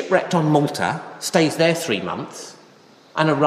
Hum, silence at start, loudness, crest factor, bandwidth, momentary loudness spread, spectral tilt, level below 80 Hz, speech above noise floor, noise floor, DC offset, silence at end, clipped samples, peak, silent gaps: none; 0 s; -20 LUFS; 18 dB; 15.5 kHz; 14 LU; -5 dB/octave; -66 dBFS; 30 dB; -50 dBFS; under 0.1%; 0 s; under 0.1%; -2 dBFS; none